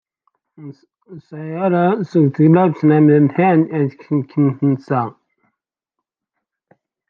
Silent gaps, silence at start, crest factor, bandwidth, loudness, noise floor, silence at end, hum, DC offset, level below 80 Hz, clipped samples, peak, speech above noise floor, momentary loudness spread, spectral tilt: none; 0.6 s; 16 dB; 4.9 kHz; -15 LUFS; -81 dBFS; 2 s; none; under 0.1%; -66 dBFS; under 0.1%; -2 dBFS; 66 dB; 10 LU; -11 dB/octave